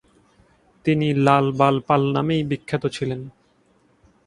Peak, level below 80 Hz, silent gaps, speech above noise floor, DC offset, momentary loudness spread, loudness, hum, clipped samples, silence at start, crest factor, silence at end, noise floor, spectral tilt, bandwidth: -2 dBFS; -56 dBFS; none; 41 dB; under 0.1%; 11 LU; -21 LUFS; none; under 0.1%; 0.85 s; 20 dB; 0.95 s; -60 dBFS; -7.5 dB/octave; 11 kHz